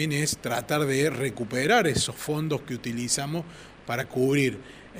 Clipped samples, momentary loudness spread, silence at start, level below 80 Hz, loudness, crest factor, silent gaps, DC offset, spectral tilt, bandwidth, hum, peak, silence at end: under 0.1%; 11 LU; 0 s; -56 dBFS; -26 LUFS; 18 dB; none; under 0.1%; -4 dB/octave; 16 kHz; none; -8 dBFS; 0 s